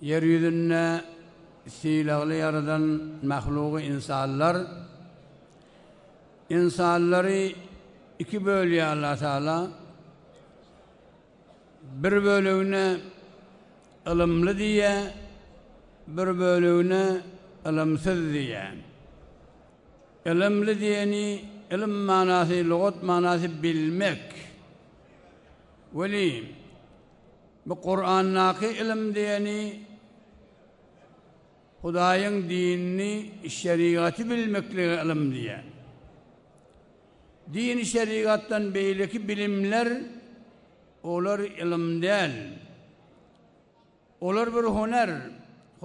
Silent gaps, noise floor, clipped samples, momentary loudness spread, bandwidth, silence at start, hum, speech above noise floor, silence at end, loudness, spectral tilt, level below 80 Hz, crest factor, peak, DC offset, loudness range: none; -61 dBFS; under 0.1%; 15 LU; 11 kHz; 0 s; none; 36 dB; 0.5 s; -26 LUFS; -6 dB/octave; -56 dBFS; 18 dB; -10 dBFS; under 0.1%; 6 LU